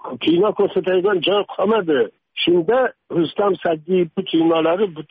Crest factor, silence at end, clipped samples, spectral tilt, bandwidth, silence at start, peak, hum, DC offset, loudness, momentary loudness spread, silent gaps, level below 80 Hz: 12 dB; 0.1 s; under 0.1%; -4 dB/octave; 4.9 kHz; 0.05 s; -8 dBFS; none; under 0.1%; -18 LUFS; 5 LU; none; -62 dBFS